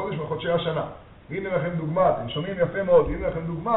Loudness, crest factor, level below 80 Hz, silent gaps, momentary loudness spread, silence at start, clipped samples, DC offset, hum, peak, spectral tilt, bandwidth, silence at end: -25 LUFS; 18 dB; -44 dBFS; none; 11 LU; 0 s; under 0.1%; under 0.1%; none; -6 dBFS; -5 dB/octave; 4.1 kHz; 0 s